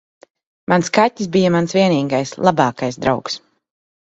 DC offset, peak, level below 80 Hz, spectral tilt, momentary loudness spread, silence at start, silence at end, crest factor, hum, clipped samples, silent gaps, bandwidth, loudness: under 0.1%; 0 dBFS; -54 dBFS; -5.5 dB/octave; 7 LU; 0.7 s; 0.7 s; 18 dB; none; under 0.1%; none; 8.2 kHz; -17 LUFS